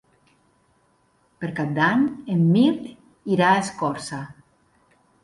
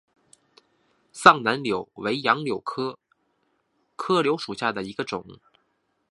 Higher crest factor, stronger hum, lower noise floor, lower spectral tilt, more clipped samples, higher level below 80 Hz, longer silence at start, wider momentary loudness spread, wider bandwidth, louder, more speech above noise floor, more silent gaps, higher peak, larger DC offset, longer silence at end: second, 18 dB vs 26 dB; neither; second, -63 dBFS vs -72 dBFS; first, -6.5 dB/octave vs -4.5 dB/octave; neither; about the same, -64 dBFS vs -66 dBFS; first, 1.4 s vs 1.15 s; about the same, 17 LU vs 16 LU; about the same, 11.5 kHz vs 11.5 kHz; about the same, -22 LUFS vs -24 LUFS; second, 43 dB vs 49 dB; neither; second, -4 dBFS vs 0 dBFS; neither; first, 0.9 s vs 0.75 s